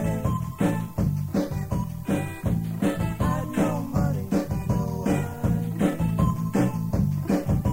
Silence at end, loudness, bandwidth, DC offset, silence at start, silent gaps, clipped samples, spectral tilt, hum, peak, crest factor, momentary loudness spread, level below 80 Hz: 0 s; -26 LUFS; 16 kHz; under 0.1%; 0 s; none; under 0.1%; -7.5 dB/octave; none; -10 dBFS; 14 dB; 4 LU; -38 dBFS